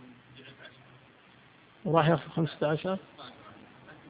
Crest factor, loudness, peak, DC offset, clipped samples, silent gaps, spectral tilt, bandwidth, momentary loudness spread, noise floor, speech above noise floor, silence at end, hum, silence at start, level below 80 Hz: 24 dB; -29 LUFS; -8 dBFS; under 0.1%; under 0.1%; none; -10.5 dB/octave; 4.9 kHz; 26 LU; -58 dBFS; 29 dB; 0 s; none; 0 s; -66 dBFS